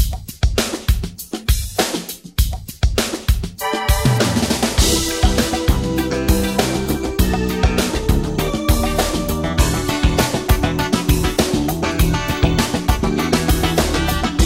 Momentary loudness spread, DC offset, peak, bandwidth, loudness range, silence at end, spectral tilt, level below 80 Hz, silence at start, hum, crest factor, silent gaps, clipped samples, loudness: 5 LU; 0.3%; 0 dBFS; 16.5 kHz; 3 LU; 0 s; -4.5 dB/octave; -22 dBFS; 0 s; none; 16 dB; none; under 0.1%; -18 LUFS